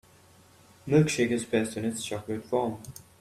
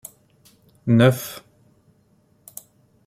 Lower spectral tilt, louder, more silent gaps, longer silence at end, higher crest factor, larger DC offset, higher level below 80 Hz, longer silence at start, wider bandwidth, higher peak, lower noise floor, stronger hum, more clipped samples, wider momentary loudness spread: about the same, -5.5 dB/octave vs -6.5 dB/octave; second, -28 LUFS vs -19 LUFS; neither; second, 0.3 s vs 1.7 s; about the same, 20 dB vs 22 dB; neither; about the same, -62 dBFS vs -60 dBFS; about the same, 0.85 s vs 0.85 s; about the same, 15 kHz vs 16 kHz; second, -10 dBFS vs -4 dBFS; about the same, -57 dBFS vs -60 dBFS; neither; neither; second, 16 LU vs 25 LU